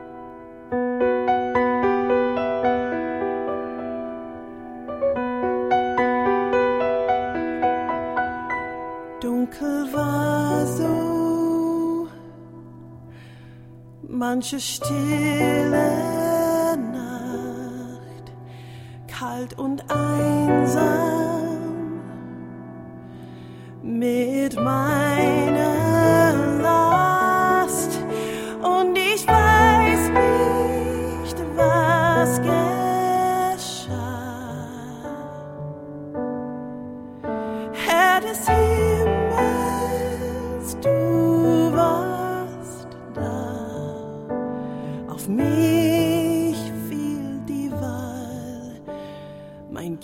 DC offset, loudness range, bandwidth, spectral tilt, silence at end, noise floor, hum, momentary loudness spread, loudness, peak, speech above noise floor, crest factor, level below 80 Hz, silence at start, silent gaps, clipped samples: under 0.1%; 10 LU; 16.5 kHz; -5.5 dB/octave; 0 s; -43 dBFS; none; 18 LU; -21 LUFS; -4 dBFS; 22 dB; 18 dB; -42 dBFS; 0 s; none; under 0.1%